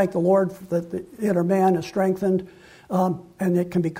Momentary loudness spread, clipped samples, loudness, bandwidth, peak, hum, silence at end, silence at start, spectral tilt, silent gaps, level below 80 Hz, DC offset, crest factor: 8 LU; under 0.1%; -23 LUFS; 16 kHz; -8 dBFS; none; 0 s; 0 s; -8 dB/octave; none; -60 dBFS; under 0.1%; 16 dB